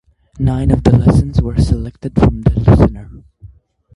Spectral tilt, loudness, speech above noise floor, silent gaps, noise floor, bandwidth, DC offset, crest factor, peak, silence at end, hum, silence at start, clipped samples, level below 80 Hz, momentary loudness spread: -9 dB/octave; -13 LUFS; 31 dB; none; -43 dBFS; 11.5 kHz; under 0.1%; 14 dB; 0 dBFS; 0.5 s; none; 0.35 s; under 0.1%; -22 dBFS; 9 LU